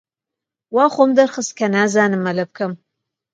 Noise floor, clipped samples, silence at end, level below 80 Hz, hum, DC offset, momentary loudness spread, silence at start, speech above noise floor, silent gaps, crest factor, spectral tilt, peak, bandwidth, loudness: -85 dBFS; under 0.1%; 0.6 s; -68 dBFS; none; under 0.1%; 12 LU; 0.7 s; 69 dB; none; 18 dB; -5 dB/octave; 0 dBFS; 9.2 kHz; -17 LUFS